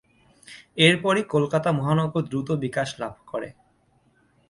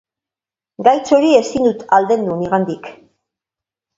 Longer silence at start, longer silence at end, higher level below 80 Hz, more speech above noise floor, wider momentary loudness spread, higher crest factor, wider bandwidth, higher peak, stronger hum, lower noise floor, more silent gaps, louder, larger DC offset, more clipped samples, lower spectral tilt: second, 0.5 s vs 0.8 s; about the same, 1 s vs 1.05 s; about the same, -60 dBFS vs -56 dBFS; second, 40 dB vs 75 dB; first, 16 LU vs 7 LU; first, 22 dB vs 16 dB; first, 11.5 kHz vs 7.8 kHz; second, -4 dBFS vs 0 dBFS; neither; second, -63 dBFS vs -89 dBFS; neither; second, -23 LUFS vs -15 LUFS; neither; neither; about the same, -5.5 dB/octave vs -5.5 dB/octave